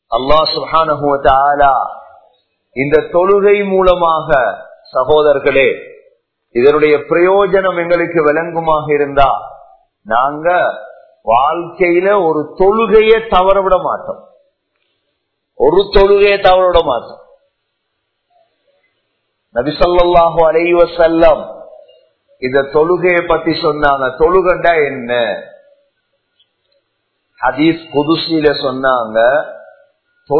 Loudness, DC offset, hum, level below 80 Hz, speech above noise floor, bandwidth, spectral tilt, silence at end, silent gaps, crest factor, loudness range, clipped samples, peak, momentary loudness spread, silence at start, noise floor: -12 LUFS; under 0.1%; none; -32 dBFS; 58 dB; 6 kHz; -8 dB/octave; 0 s; none; 12 dB; 4 LU; 0.2%; 0 dBFS; 9 LU; 0.1 s; -69 dBFS